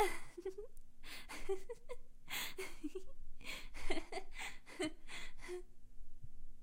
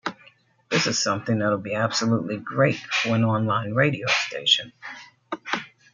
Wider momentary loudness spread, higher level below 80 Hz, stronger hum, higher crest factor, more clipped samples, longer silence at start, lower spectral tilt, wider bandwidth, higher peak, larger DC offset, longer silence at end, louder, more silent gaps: about the same, 17 LU vs 15 LU; first, -50 dBFS vs -66 dBFS; neither; about the same, 20 dB vs 20 dB; neither; about the same, 0 s vs 0.05 s; about the same, -3 dB/octave vs -4 dB/octave; first, 16 kHz vs 9.2 kHz; second, -22 dBFS vs -4 dBFS; neither; second, 0 s vs 0.25 s; second, -47 LUFS vs -23 LUFS; neither